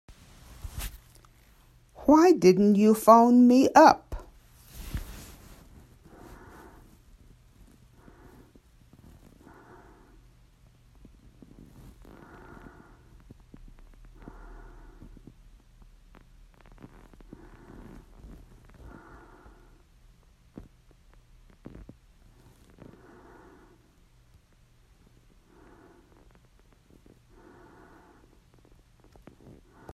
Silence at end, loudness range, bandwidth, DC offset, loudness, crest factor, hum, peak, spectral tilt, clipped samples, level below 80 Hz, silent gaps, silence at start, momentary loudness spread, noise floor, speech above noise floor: 24.85 s; 27 LU; 14.5 kHz; under 0.1%; -20 LUFS; 26 dB; none; -4 dBFS; -6 dB/octave; under 0.1%; -52 dBFS; none; 0.65 s; 32 LU; -60 dBFS; 42 dB